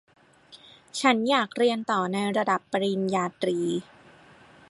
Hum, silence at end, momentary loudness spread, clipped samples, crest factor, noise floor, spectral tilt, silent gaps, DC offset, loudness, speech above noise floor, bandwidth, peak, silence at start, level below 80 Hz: none; 0.85 s; 5 LU; under 0.1%; 22 dB; -53 dBFS; -4.5 dB/octave; none; under 0.1%; -26 LUFS; 28 dB; 11.5 kHz; -6 dBFS; 0.5 s; -74 dBFS